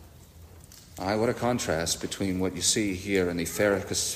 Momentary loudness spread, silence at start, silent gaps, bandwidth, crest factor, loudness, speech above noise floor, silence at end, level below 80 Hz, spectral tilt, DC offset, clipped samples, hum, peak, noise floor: 6 LU; 0 s; none; 15.5 kHz; 18 dB; -27 LUFS; 22 dB; 0 s; -54 dBFS; -3.5 dB/octave; under 0.1%; under 0.1%; none; -12 dBFS; -50 dBFS